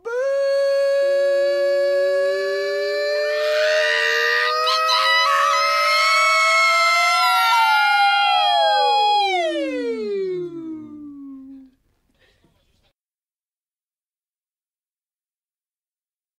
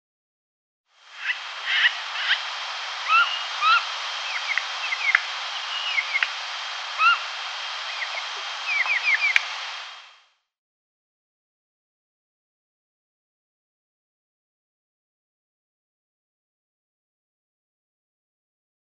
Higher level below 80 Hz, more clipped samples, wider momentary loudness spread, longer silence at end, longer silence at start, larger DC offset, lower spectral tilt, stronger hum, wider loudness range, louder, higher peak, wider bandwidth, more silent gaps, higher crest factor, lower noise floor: first, -70 dBFS vs under -90 dBFS; neither; about the same, 11 LU vs 10 LU; second, 4.75 s vs 8.8 s; second, 0.05 s vs 1.05 s; neither; first, -0.5 dB/octave vs 6.5 dB/octave; neither; first, 13 LU vs 4 LU; first, -17 LUFS vs -23 LUFS; second, -6 dBFS vs 0 dBFS; first, 15 kHz vs 11 kHz; neither; second, 14 dB vs 28 dB; first, under -90 dBFS vs -58 dBFS